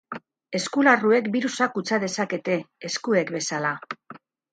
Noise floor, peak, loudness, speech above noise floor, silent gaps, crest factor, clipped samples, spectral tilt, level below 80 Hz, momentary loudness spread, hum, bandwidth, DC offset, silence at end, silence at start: -48 dBFS; -6 dBFS; -24 LUFS; 24 dB; none; 18 dB; under 0.1%; -4 dB/octave; -74 dBFS; 16 LU; none; 9.4 kHz; under 0.1%; 0.35 s; 0.1 s